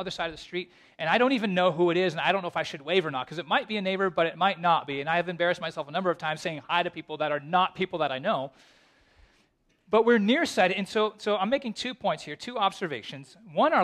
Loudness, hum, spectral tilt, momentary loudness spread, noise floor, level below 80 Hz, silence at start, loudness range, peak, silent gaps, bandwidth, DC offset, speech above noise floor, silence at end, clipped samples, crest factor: -27 LUFS; none; -5 dB/octave; 11 LU; -68 dBFS; -66 dBFS; 0 s; 3 LU; -8 dBFS; none; 13 kHz; under 0.1%; 41 dB; 0 s; under 0.1%; 20 dB